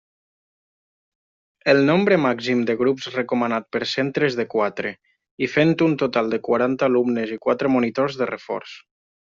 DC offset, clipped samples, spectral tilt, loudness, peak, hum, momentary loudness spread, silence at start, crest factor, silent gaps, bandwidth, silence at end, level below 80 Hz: under 0.1%; under 0.1%; -4.5 dB/octave; -21 LUFS; -4 dBFS; none; 9 LU; 1.65 s; 18 dB; 5.31-5.38 s; 7.6 kHz; 0.45 s; -64 dBFS